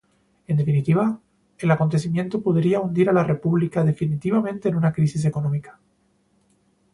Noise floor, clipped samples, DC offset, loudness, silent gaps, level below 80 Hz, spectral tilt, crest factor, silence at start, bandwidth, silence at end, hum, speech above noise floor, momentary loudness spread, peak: -64 dBFS; under 0.1%; under 0.1%; -22 LUFS; none; -56 dBFS; -8.5 dB/octave; 16 dB; 0.5 s; 11 kHz; 1.2 s; none; 43 dB; 6 LU; -6 dBFS